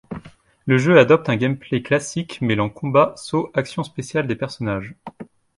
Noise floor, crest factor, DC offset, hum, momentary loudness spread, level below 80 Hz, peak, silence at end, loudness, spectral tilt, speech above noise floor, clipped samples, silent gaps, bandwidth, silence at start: -43 dBFS; 20 dB; under 0.1%; none; 19 LU; -54 dBFS; 0 dBFS; 0.35 s; -20 LUFS; -6 dB/octave; 24 dB; under 0.1%; none; 11.5 kHz; 0.1 s